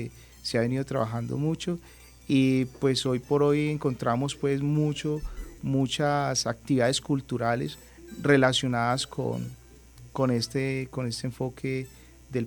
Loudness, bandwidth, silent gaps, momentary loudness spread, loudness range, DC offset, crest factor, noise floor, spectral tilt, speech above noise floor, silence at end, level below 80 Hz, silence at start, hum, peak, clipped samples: -27 LUFS; 18 kHz; none; 12 LU; 3 LU; under 0.1%; 20 dB; -50 dBFS; -5.5 dB/octave; 23 dB; 0 s; -50 dBFS; 0 s; none; -6 dBFS; under 0.1%